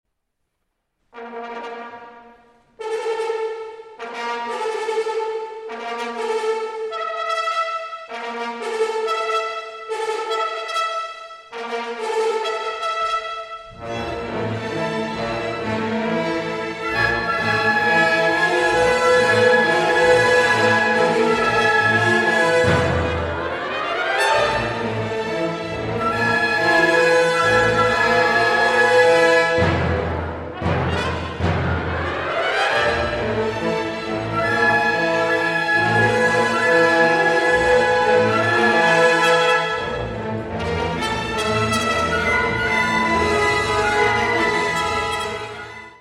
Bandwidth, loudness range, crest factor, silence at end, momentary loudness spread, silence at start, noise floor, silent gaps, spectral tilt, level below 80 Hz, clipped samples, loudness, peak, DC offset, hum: 14 kHz; 9 LU; 16 dB; 0.1 s; 13 LU; 1.15 s; -74 dBFS; none; -4.5 dB/octave; -42 dBFS; under 0.1%; -19 LUFS; -2 dBFS; under 0.1%; none